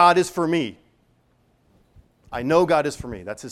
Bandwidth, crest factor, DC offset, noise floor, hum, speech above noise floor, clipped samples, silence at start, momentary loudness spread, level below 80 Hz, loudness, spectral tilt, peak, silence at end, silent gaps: 14.5 kHz; 20 dB; under 0.1%; -62 dBFS; none; 42 dB; under 0.1%; 0 s; 16 LU; -52 dBFS; -22 LUFS; -5 dB/octave; -4 dBFS; 0 s; none